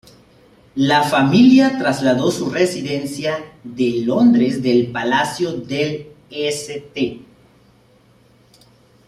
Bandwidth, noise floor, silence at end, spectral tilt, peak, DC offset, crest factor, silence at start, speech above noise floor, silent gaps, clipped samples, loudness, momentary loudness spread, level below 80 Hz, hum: 13.5 kHz; -52 dBFS; 1.85 s; -5.5 dB/octave; -2 dBFS; under 0.1%; 16 dB; 0.75 s; 36 dB; none; under 0.1%; -17 LUFS; 13 LU; -56 dBFS; none